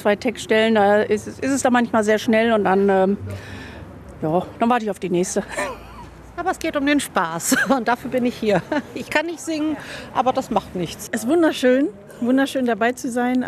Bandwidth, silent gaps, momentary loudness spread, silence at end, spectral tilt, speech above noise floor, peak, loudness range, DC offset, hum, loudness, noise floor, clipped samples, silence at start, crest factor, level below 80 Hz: 14 kHz; none; 12 LU; 0 s; -4.5 dB/octave; 19 dB; -4 dBFS; 5 LU; under 0.1%; none; -20 LUFS; -39 dBFS; under 0.1%; 0 s; 16 dB; -50 dBFS